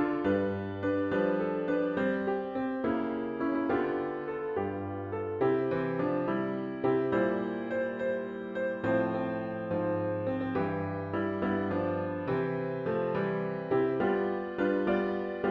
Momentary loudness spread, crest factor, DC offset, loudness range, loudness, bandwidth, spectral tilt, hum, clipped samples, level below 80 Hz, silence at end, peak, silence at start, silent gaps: 5 LU; 14 dB; under 0.1%; 1 LU; -31 LUFS; 5.4 kHz; -9.5 dB/octave; none; under 0.1%; -64 dBFS; 0 s; -16 dBFS; 0 s; none